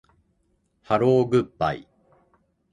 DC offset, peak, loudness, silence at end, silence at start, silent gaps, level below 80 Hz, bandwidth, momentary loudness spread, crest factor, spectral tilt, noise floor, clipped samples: under 0.1%; -8 dBFS; -22 LUFS; 0.9 s; 0.9 s; none; -56 dBFS; 10 kHz; 8 LU; 18 dB; -8 dB/octave; -69 dBFS; under 0.1%